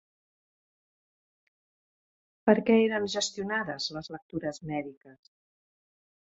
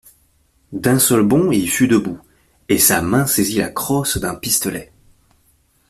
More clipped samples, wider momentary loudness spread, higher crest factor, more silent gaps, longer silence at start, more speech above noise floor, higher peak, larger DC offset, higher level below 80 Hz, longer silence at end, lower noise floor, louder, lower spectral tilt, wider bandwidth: neither; about the same, 14 LU vs 12 LU; first, 26 dB vs 18 dB; first, 4.22-4.29 s, 4.97-5.01 s vs none; first, 2.45 s vs 0.7 s; first, over 61 dB vs 42 dB; second, -8 dBFS vs 0 dBFS; neither; second, -70 dBFS vs -46 dBFS; first, 1.2 s vs 1.05 s; first, under -90 dBFS vs -58 dBFS; second, -29 LUFS vs -16 LUFS; about the same, -4.5 dB/octave vs -4 dB/octave; second, 8 kHz vs 16 kHz